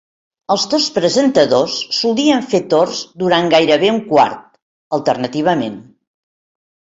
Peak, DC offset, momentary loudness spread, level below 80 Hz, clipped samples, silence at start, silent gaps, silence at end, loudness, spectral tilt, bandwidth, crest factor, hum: 0 dBFS; under 0.1%; 8 LU; -58 dBFS; under 0.1%; 0.5 s; 4.62-4.91 s; 1 s; -15 LUFS; -4 dB/octave; 8 kHz; 16 dB; none